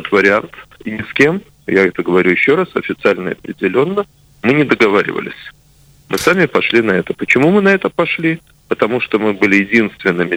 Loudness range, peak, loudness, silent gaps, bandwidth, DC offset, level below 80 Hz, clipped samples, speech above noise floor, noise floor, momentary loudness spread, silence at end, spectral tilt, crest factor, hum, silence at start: 2 LU; 0 dBFS; -14 LUFS; none; over 20 kHz; under 0.1%; -52 dBFS; under 0.1%; 33 dB; -47 dBFS; 12 LU; 0 s; -6 dB/octave; 14 dB; none; 0 s